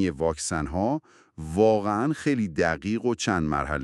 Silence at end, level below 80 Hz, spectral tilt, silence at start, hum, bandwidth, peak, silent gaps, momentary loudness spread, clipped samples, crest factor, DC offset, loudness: 0 s; -44 dBFS; -5.5 dB/octave; 0 s; none; 12 kHz; -8 dBFS; none; 7 LU; under 0.1%; 18 dB; under 0.1%; -26 LUFS